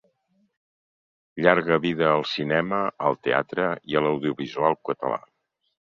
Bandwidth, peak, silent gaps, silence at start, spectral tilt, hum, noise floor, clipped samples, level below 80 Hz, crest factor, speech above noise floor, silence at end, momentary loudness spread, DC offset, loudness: 7.2 kHz; -2 dBFS; none; 1.35 s; -7 dB/octave; none; -68 dBFS; under 0.1%; -64 dBFS; 24 dB; 45 dB; 0.65 s; 8 LU; under 0.1%; -24 LUFS